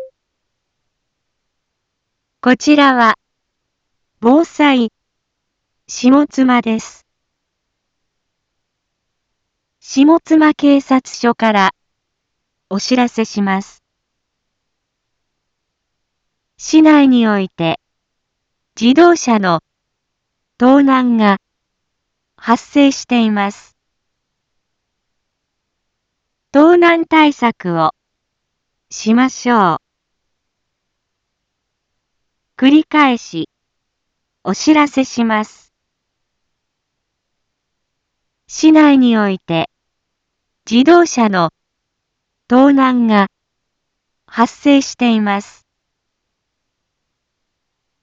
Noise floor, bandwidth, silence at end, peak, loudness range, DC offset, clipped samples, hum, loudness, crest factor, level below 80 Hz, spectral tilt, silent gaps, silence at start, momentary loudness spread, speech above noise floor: -74 dBFS; 7.8 kHz; 2.6 s; 0 dBFS; 8 LU; under 0.1%; under 0.1%; none; -12 LUFS; 16 dB; -60 dBFS; -5 dB/octave; none; 0 s; 12 LU; 63 dB